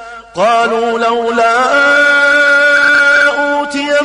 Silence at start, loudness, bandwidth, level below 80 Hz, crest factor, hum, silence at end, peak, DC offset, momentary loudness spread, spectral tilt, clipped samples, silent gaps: 0 s; -9 LUFS; 11 kHz; -50 dBFS; 8 dB; none; 0 s; -2 dBFS; under 0.1%; 7 LU; -2 dB/octave; under 0.1%; none